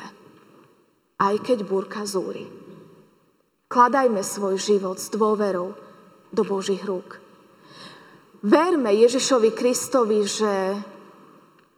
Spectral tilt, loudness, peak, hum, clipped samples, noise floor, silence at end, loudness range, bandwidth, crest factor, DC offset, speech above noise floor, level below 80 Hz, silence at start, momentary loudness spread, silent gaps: -4 dB/octave; -22 LUFS; -4 dBFS; none; under 0.1%; -65 dBFS; 0.8 s; 7 LU; 17 kHz; 20 dB; under 0.1%; 43 dB; -78 dBFS; 0 s; 19 LU; none